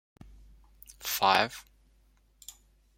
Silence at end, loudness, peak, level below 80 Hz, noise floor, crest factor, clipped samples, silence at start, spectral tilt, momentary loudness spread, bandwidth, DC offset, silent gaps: 1.35 s; -27 LUFS; -6 dBFS; -60 dBFS; -65 dBFS; 28 dB; under 0.1%; 1 s; -2 dB/octave; 25 LU; 16.5 kHz; under 0.1%; none